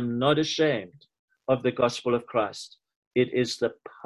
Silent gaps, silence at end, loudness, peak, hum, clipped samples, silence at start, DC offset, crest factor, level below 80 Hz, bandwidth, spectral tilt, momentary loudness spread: 1.19-1.28 s, 2.96-3.11 s; 0.15 s; -26 LUFS; -8 dBFS; none; under 0.1%; 0 s; under 0.1%; 18 dB; -64 dBFS; 12 kHz; -5 dB/octave; 13 LU